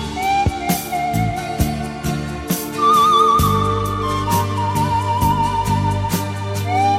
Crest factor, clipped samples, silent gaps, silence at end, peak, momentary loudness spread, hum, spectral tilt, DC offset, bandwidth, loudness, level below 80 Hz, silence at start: 16 dB; under 0.1%; none; 0 s; -2 dBFS; 10 LU; none; -5 dB/octave; under 0.1%; 16.5 kHz; -18 LUFS; -32 dBFS; 0 s